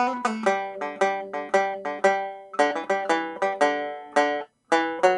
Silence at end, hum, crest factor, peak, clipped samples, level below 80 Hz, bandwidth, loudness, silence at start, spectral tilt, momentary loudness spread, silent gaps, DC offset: 0 s; none; 18 dB; -6 dBFS; under 0.1%; -74 dBFS; 11.5 kHz; -25 LUFS; 0 s; -3.5 dB/octave; 6 LU; none; under 0.1%